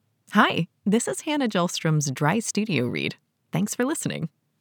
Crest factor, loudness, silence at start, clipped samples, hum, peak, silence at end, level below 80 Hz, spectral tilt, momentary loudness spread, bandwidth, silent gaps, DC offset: 22 dB; -25 LUFS; 0.3 s; under 0.1%; none; -4 dBFS; 0.35 s; -86 dBFS; -4.5 dB/octave; 9 LU; over 20 kHz; none; under 0.1%